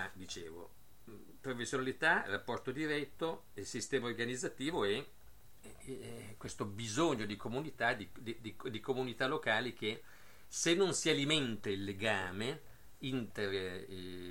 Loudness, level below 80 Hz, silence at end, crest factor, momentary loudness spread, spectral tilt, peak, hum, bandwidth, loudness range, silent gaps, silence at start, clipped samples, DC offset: -37 LUFS; -66 dBFS; 0 s; 22 dB; 16 LU; -3.5 dB/octave; -18 dBFS; none; 16.5 kHz; 5 LU; none; 0 s; under 0.1%; 0.2%